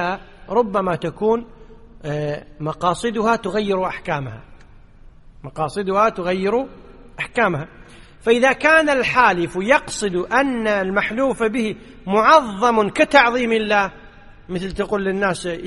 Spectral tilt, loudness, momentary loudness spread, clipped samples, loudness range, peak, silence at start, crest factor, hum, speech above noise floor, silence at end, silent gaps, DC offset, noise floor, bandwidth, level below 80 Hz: -5 dB/octave; -19 LUFS; 14 LU; under 0.1%; 7 LU; 0 dBFS; 0 s; 20 dB; none; 25 dB; 0 s; none; under 0.1%; -44 dBFS; 11.5 kHz; -44 dBFS